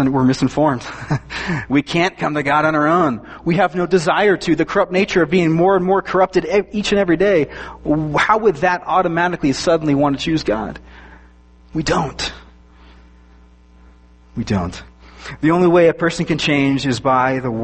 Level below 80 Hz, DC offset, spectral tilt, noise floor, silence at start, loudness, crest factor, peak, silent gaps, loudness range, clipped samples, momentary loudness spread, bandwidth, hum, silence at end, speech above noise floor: -42 dBFS; under 0.1%; -6 dB/octave; -46 dBFS; 0 s; -17 LUFS; 16 dB; -2 dBFS; none; 10 LU; under 0.1%; 10 LU; 8.8 kHz; none; 0 s; 30 dB